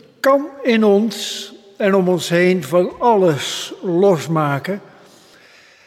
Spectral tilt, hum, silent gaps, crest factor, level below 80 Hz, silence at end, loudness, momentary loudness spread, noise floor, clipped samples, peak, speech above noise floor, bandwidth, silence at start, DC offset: -5.5 dB/octave; none; none; 14 dB; -64 dBFS; 1.1 s; -17 LUFS; 10 LU; -47 dBFS; under 0.1%; -4 dBFS; 31 dB; 15.5 kHz; 0.25 s; under 0.1%